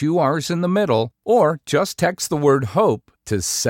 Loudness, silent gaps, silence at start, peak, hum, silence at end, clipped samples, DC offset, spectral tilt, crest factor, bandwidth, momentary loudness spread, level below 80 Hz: -19 LUFS; none; 0 s; -6 dBFS; none; 0 s; under 0.1%; under 0.1%; -5 dB/octave; 14 dB; 17 kHz; 4 LU; -54 dBFS